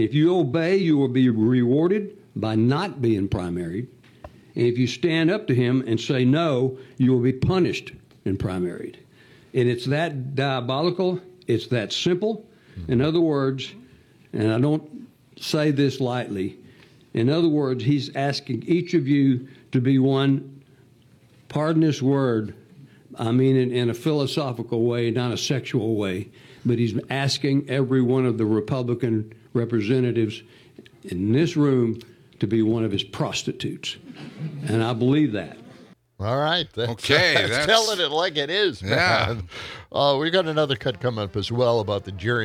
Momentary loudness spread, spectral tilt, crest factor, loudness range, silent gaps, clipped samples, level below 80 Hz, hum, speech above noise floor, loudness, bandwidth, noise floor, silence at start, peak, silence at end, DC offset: 12 LU; -6 dB/octave; 22 dB; 4 LU; none; under 0.1%; -56 dBFS; none; 32 dB; -23 LUFS; 14.5 kHz; -54 dBFS; 0 s; -2 dBFS; 0 s; under 0.1%